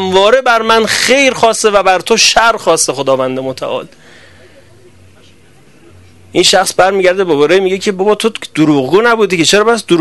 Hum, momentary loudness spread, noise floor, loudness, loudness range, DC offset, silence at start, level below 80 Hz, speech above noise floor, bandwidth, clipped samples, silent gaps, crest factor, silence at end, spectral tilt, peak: none; 7 LU; -44 dBFS; -10 LUFS; 9 LU; 0.7%; 0 s; -46 dBFS; 34 dB; 12.5 kHz; 0.3%; none; 12 dB; 0 s; -3 dB/octave; 0 dBFS